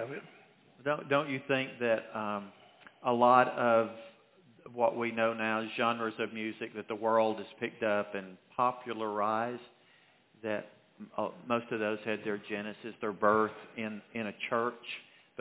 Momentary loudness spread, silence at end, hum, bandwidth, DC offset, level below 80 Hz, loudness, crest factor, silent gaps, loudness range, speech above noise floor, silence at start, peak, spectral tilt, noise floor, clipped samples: 14 LU; 0.4 s; none; 4 kHz; under 0.1%; -80 dBFS; -33 LUFS; 24 dB; none; 7 LU; 32 dB; 0 s; -10 dBFS; -3.5 dB/octave; -65 dBFS; under 0.1%